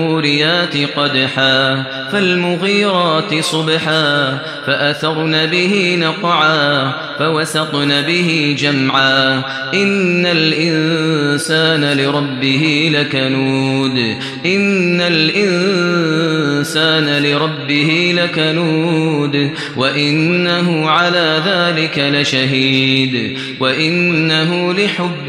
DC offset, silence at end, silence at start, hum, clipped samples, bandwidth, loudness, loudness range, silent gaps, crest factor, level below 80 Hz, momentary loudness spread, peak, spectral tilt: under 0.1%; 0 s; 0 s; none; under 0.1%; 13.5 kHz; -13 LUFS; 1 LU; none; 14 dB; -60 dBFS; 4 LU; 0 dBFS; -5 dB/octave